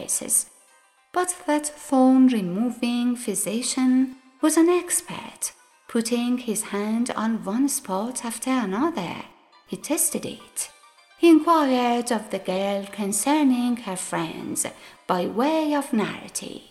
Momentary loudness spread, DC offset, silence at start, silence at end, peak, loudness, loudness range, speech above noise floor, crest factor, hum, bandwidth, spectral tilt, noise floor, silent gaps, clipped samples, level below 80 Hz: 13 LU; under 0.1%; 0 s; 0.1 s; -6 dBFS; -23 LUFS; 4 LU; 36 dB; 18 dB; none; 15 kHz; -3.5 dB/octave; -59 dBFS; none; under 0.1%; -66 dBFS